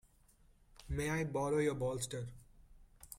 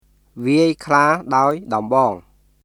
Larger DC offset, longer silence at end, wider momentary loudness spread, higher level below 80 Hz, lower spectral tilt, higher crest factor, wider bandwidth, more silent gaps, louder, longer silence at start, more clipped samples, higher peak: neither; second, 0 s vs 0.45 s; about the same, 10 LU vs 8 LU; about the same, -56 dBFS vs -56 dBFS; about the same, -5.5 dB/octave vs -6 dB/octave; about the same, 16 dB vs 18 dB; first, 16.5 kHz vs 13.5 kHz; neither; second, -38 LUFS vs -17 LUFS; first, 0.85 s vs 0.35 s; neither; second, -24 dBFS vs 0 dBFS